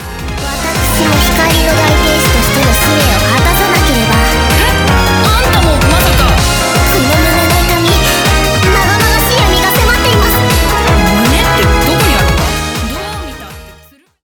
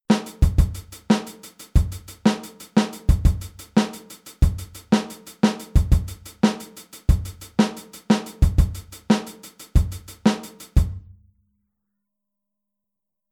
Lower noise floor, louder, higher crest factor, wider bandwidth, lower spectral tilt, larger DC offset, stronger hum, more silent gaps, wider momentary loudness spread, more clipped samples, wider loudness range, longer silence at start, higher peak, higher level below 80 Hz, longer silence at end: second, -42 dBFS vs -85 dBFS; first, -9 LUFS vs -23 LUFS; second, 10 dB vs 18 dB; first, over 20 kHz vs 18 kHz; second, -4 dB/octave vs -6.5 dB/octave; neither; neither; neither; second, 6 LU vs 16 LU; neither; second, 1 LU vs 4 LU; about the same, 0 s vs 0.1 s; first, 0 dBFS vs -4 dBFS; first, -16 dBFS vs -26 dBFS; second, 0.5 s vs 2.35 s